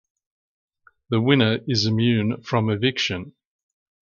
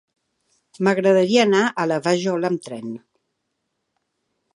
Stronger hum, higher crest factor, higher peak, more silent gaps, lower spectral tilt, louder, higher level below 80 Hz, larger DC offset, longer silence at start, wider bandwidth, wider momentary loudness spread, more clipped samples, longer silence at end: neither; about the same, 18 dB vs 18 dB; about the same, -4 dBFS vs -2 dBFS; neither; about the same, -6 dB/octave vs -5 dB/octave; about the same, -21 LUFS vs -19 LUFS; first, -54 dBFS vs -74 dBFS; neither; first, 1.1 s vs 0.8 s; second, 7.2 kHz vs 11 kHz; second, 7 LU vs 16 LU; neither; second, 0.75 s vs 1.6 s